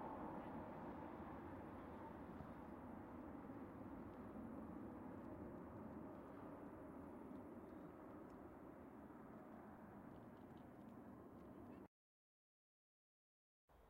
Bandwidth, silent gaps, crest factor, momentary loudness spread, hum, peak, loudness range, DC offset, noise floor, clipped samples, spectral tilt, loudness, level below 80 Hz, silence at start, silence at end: 16 kHz; 11.87-13.68 s; 16 dB; 6 LU; none; -42 dBFS; 6 LU; under 0.1%; under -90 dBFS; under 0.1%; -8.5 dB/octave; -57 LUFS; -74 dBFS; 0 s; 0 s